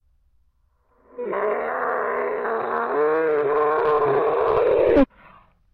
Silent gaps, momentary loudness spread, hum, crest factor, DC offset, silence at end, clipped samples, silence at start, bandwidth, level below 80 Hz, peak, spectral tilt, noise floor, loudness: none; 7 LU; none; 16 dB; under 0.1%; 0.7 s; under 0.1%; 1.15 s; 5 kHz; -46 dBFS; -6 dBFS; -8.5 dB/octave; -64 dBFS; -21 LUFS